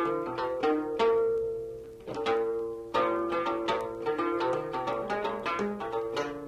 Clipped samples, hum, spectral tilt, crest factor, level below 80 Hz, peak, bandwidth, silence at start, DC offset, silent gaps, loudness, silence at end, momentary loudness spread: under 0.1%; none; -5.5 dB/octave; 14 dB; -60 dBFS; -16 dBFS; 11.5 kHz; 0 s; under 0.1%; none; -30 LUFS; 0 s; 7 LU